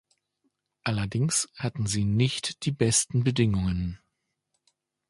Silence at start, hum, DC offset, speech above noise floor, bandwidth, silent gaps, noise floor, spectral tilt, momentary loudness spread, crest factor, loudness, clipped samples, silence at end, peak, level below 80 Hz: 0.85 s; none; under 0.1%; 53 dB; 11.5 kHz; none; -79 dBFS; -4.5 dB/octave; 9 LU; 20 dB; -26 LUFS; under 0.1%; 1.15 s; -8 dBFS; -46 dBFS